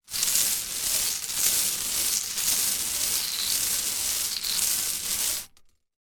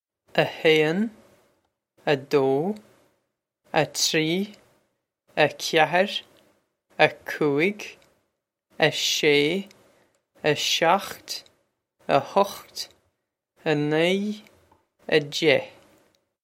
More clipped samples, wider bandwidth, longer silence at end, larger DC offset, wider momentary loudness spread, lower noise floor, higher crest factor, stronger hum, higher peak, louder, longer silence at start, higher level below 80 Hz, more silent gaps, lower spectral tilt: neither; first, 19.5 kHz vs 16.5 kHz; second, 0.55 s vs 0.75 s; neither; second, 4 LU vs 15 LU; second, -58 dBFS vs -77 dBFS; about the same, 24 dB vs 24 dB; neither; about the same, -4 dBFS vs -2 dBFS; about the same, -24 LUFS vs -23 LUFS; second, 0.1 s vs 0.35 s; first, -56 dBFS vs -72 dBFS; neither; second, 1.5 dB/octave vs -3.5 dB/octave